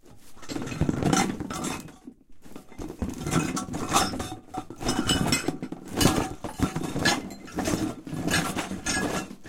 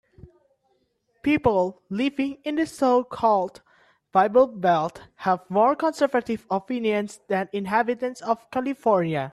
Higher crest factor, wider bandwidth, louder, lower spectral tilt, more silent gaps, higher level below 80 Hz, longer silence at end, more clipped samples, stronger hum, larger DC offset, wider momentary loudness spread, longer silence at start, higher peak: first, 24 dB vs 18 dB; first, 17 kHz vs 13 kHz; second, -28 LUFS vs -24 LUFS; second, -4 dB/octave vs -6.5 dB/octave; neither; first, -44 dBFS vs -58 dBFS; about the same, 0 s vs 0 s; neither; neither; neither; first, 14 LU vs 8 LU; second, 0.05 s vs 0.25 s; about the same, -4 dBFS vs -6 dBFS